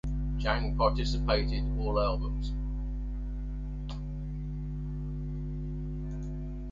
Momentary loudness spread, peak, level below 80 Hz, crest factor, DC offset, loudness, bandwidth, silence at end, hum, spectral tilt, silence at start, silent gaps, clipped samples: 10 LU; -12 dBFS; -34 dBFS; 20 dB; under 0.1%; -34 LUFS; 7.4 kHz; 0 s; 50 Hz at -35 dBFS; -7 dB/octave; 0.05 s; none; under 0.1%